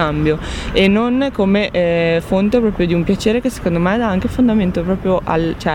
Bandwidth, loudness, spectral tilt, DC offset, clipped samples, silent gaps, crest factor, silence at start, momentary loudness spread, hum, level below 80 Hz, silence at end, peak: 16.5 kHz; -16 LUFS; -6.5 dB/octave; under 0.1%; under 0.1%; none; 12 dB; 0 s; 4 LU; none; -32 dBFS; 0 s; -2 dBFS